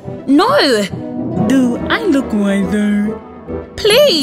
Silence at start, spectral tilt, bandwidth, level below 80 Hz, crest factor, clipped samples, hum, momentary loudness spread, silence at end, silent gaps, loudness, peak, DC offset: 0.05 s; -5 dB/octave; 15.5 kHz; -42 dBFS; 12 dB; under 0.1%; none; 13 LU; 0 s; none; -14 LUFS; 0 dBFS; under 0.1%